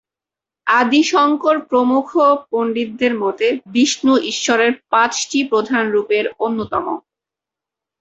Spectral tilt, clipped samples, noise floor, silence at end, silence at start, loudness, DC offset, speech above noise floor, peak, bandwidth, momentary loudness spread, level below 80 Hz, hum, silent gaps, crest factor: -3 dB/octave; under 0.1%; -88 dBFS; 1 s; 0.65 s; -16 LUFS; under 0.1%; 72 dB; -2 dBFS; 8.2 kHz; 7 LU; -60 dBFS; none; none; 16 dB